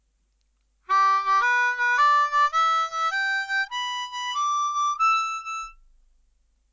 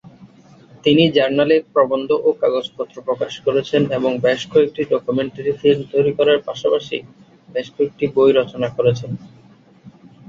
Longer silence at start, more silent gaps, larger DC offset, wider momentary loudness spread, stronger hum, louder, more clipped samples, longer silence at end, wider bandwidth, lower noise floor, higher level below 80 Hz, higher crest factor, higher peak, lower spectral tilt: first, 0.9 s vs 0.2 s; neither; neither; second, 9 LU vs 12 LU; neither; second, -22 LUFS vs -18 LUFS; neither; first, 1 s vs 0.4 s; about the same, 7.6 kHz vs 7.4 kHz; first, -69 dBFS vs -48 dBFS; second, -64 dBFS vs -58 dBFS; about the same, 14 dB vs 16 dB; second, -12 dBFS vs -2 dBFS; second, 2.5 dB/octave vs -6.5 dB/octave